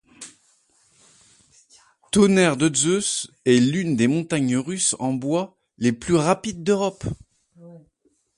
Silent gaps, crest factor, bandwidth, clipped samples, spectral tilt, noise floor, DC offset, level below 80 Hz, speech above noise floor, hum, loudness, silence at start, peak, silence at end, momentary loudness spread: none; 18 dB; 11.5 kHz; under 0.1%; -4.5 dB/octave; -66 dBFS; under 0.1%; -54 dBFS; 46 dB; none; -21 LUFS; 0.2 s; -4 dBFS; 0.6 s; 15 LU